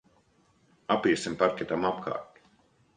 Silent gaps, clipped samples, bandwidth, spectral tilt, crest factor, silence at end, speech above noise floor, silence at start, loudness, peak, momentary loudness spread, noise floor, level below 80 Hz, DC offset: none; under 0.1%; 10 kHz; -5 dB/octave; 22 dB; 0.7 s; 38 dB; 0.9 s; -29 LUFS; -10 dBFS; 11 LU; -66 dBFS; -66 dBFS; under 0.1%